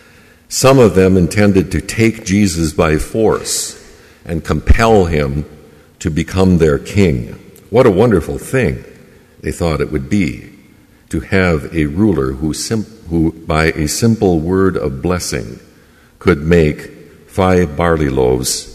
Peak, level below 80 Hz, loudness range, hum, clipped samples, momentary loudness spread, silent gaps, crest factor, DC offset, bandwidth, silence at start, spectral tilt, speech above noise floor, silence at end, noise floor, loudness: 0 dBFS; -28 dBFS; 4 LU; none; under 0.1%; 13 LU; none; 14 dB; under 0.1%; 15 kHz; 0.5 s; -5.5 dB/octave; 33 dB; 0 s; -46 dBFS; -14 LUFS